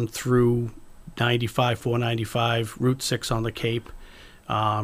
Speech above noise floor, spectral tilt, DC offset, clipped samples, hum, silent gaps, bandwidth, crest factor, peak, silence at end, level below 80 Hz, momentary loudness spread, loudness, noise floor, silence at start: 22 dB; -5.5 dB/octave; under 0.1%; under 0.1%; none; none; 15.5 kHz; 16 dB; -8 dBFS; 0 s; -46 dBFS; 8 LU; -25 LUFS; -46 dBFS; 0 s